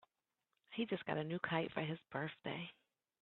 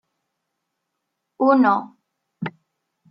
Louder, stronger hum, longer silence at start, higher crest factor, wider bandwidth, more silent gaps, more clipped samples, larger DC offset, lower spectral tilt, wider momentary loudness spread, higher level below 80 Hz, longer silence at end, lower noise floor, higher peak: second, -43 LUFS vs -18 LUFS; neither; second, 0.7 s vs 1.4 s; about the same, 22 dB vs 18 dB; second, 4.3 kHz vs 5.6 kHz; neither; neither; neither; second, -4 dB/octave vs -9 dB/octave; second, 8 LU vs 17 LU; about the same, -80 dBFS vs -78 dBFS; about the same, 0.55 s vs 0.6 s; first, -89 dBFS vs -79 dBFS; second, -22 dBFS vs -6 dBFS